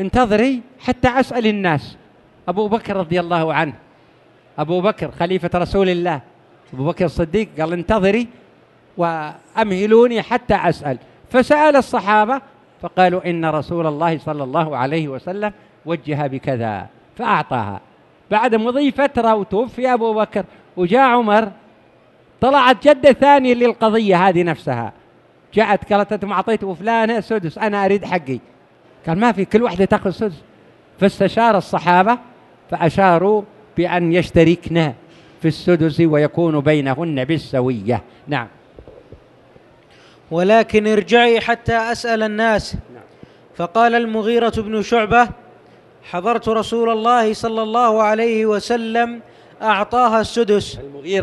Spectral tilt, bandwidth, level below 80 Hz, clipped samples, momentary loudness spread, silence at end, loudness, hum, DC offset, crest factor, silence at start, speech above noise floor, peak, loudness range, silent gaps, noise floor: -6.5 dB/octave; 12 kHz; -44 dBFS; under 0.1%; 12 LU; 0 s; -17 LUFS; none; under 0.1%; 18 dB; 0 s; 34 dB; 0 dBFS; 6 LU; none; -51 dBFS